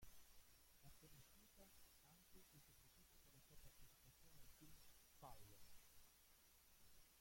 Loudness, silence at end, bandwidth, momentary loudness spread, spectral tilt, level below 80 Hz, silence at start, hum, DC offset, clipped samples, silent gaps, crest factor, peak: -68 LUFS; 0 s; 16.5 kHz; 4 LU; -3 dB/octave; -74 dBFS; 0 s; none; under 0.1%; under 0.1%; none; 18 dB; -48 dBFS